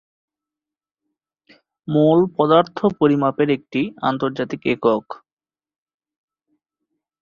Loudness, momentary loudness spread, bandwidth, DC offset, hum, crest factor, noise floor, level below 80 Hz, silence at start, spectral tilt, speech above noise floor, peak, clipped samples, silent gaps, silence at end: -19 LUFS; 9 LU; 6.8 kHz; under 0.1%; none; 20 dB; under -90 dBFS; -62 dBFS; 1.9 s; -8.5 dB/octave; over 72 dB; -2 dBFS; under 0.1%; none; 2.05 s